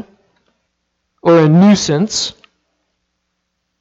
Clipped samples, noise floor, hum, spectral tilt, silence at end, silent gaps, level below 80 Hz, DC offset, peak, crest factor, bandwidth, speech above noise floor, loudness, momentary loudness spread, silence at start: under 0.1%; -71 dBFS; none; -5.5 dB/octave; 1.5 s; none; -54 dBFS; under 0.1%; 0 dBFS; 16 dB; 8 kHz; 61 dB; -12 LUFS; 10 LU; 1.25 s